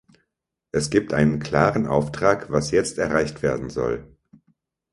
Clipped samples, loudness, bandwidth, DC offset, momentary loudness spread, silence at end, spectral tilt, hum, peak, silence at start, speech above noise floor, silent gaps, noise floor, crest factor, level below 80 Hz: under 0.1%; -22 LUFS; 11.5 kHz; under 0.1%; 7 LU; 0.85 s; -5.5 dB/octave; none; 0 dBFS; 0.75 s; 59 dB; none; -80 dBFS; 22 dB; -46 dBFS